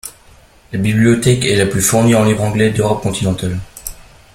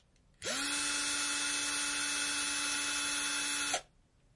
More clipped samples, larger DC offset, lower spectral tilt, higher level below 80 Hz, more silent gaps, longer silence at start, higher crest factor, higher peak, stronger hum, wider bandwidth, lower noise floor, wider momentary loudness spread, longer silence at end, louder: neither; neither; first, -5 dB/octave vs 1 dB/octave; first, -38 dBFS vs -66 dBFS; neither; second, 0.05 s vs 0.4 s; about the same, 14 dB vs 18 dB; first, 0 dBFS vs -18 dBFS; neither; first, 16.5 kHz vs 11.5 kHz; second, -45 dBFS vs -67 dBFS; first, 16 LU vs 4 LU; second, 0.3 s vs 0.55 s; first, -14 LUFS vs -32 LUFS